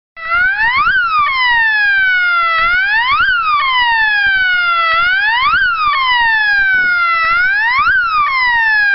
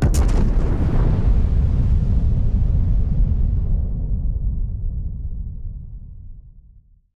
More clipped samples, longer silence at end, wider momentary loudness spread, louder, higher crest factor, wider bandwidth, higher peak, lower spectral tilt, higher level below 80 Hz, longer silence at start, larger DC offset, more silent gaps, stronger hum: neither; second, 0 s vs 0.55 s; second, 2 LU vs 15 LU; first, -11 LUFS vs -22 LUFS; about the same, 8 dB vs 10 dB; second, 5.8 kHz vs 11 kHz; first, -4 dBFS vs -8 dBFS; second, 3.5 dB/octave vs -8 dB/octave; second, -40 dBFS vs -20 dBFS; first, 0.15 s vs 0 s; neither; neither; neither